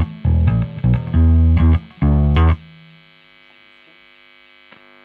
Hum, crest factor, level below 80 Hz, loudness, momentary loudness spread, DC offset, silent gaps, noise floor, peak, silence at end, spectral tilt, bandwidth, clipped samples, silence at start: 50 Hz at -45 dBFS; 14 dB; -22 dBFS; -16 LUFS; 5 LU; under 0.1%; none; -49 dBFS; -4 dBFS; 2.45 s; -11 dB/octave; 4 kHz; under 0.1%; 0 s